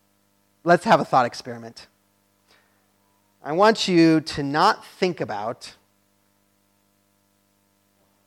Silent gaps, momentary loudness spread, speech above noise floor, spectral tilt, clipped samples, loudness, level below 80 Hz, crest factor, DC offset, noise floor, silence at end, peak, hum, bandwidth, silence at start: none; 21 LU; 45 dB; -5.5 dB/octave; under 0.1%; -20 LUFS; -62 dBFS; 20 dB; under 0.1%; -66 dBFS; 2.55 s; -4 dBFS; 50 Hz at -55 dBFS; 13 kHz; 0.65 s